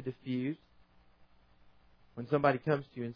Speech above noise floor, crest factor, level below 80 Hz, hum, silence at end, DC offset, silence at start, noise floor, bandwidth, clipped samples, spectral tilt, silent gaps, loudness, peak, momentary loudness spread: 31 dB; 24 dB; -70 dBFS; none; 0 s; under 0.1%; 0 s; -64 dBFS; 5.4 kHz; under 0.1%; -6.5 dB/octave; none; -33 LUFS; -12 dBFS; 17 LU